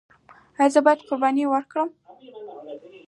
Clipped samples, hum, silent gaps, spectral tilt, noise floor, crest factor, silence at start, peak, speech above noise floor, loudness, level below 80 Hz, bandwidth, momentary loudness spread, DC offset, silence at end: under 0.1%; none; none; -3.5 dB/octave; -42 dBFS; 20 dB; 0.6 s; -4 dBFS; 21 dB; -21 LUFS; -76 dBFS; 11 kHz; 22 LU; under 0.1%; 0.1 s